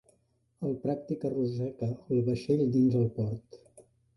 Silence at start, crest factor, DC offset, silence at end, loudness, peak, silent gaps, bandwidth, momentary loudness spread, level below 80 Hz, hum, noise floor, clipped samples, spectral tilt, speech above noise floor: 0.6 s; 16 dB; under 0.1%; 0.35 s; -30 LUFS; -16 dBFS; none; 11.5 kHz; 10 LU; -62 dBFS; none; -71 dBFS; under 0.1%; -9.5 dB/octave; 42 dB